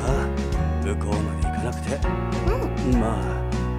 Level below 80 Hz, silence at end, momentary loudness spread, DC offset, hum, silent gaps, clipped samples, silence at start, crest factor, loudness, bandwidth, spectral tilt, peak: -28 dBFS; 0 s; 4 LU; under 0.1%; none; none; under 0.1%; 0 s; 16 dB; -25 LUFS; 13.5 kHz; -7 dB/octave; -6 dBFS